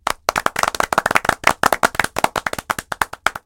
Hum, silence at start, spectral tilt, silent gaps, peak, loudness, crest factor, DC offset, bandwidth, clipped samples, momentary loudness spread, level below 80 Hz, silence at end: none; 0.05 s; -2 dB/octave; none; 0 dBFS; -19 LUFS; 20 dB; under 0.1%; over 20 kHz; 0.1%; 8 LU; -44 dBFS; 0.1 s